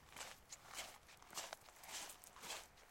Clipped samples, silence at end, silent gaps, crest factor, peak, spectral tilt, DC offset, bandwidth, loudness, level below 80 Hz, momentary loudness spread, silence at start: under 0.1%; 0 s; none; 24 dB; -30 dBFS; 0 dB/octave; under 0.1%; 16.5 kHz; -52 LUFS; -76 dBFS; 5 LU; 0 s